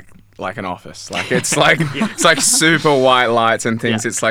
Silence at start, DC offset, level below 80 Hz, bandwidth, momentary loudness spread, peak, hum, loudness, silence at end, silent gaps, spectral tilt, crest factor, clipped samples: 0.1 s; under 0.1%; -52 dBFS; over 20 kHz; 15 LU; 0 dBFS; none; -14 LUFS; 0 s; none; -3 dB/octave; 16 dB; under 0.1%